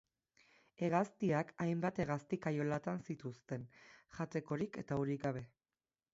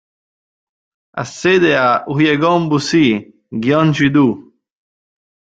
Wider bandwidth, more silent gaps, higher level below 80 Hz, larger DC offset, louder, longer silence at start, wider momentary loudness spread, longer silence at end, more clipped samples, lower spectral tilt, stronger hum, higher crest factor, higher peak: second, 7.6 kHz vs 8.8 kHz; neither; second, -72 dBFS vs -52 dBFS; neither; second, -40 LUFS vs -14 LUFS; second, 0.8 s vs 1.15 s; second, 11 LU vs 14 LU; second, 0.7 s vs 1.15 s; neither; first, -7.5 dB/octave vs -6 dB/octave; neither; first, 20 dB vs 14 dB; second, -20 dBFS vs -2 dBFS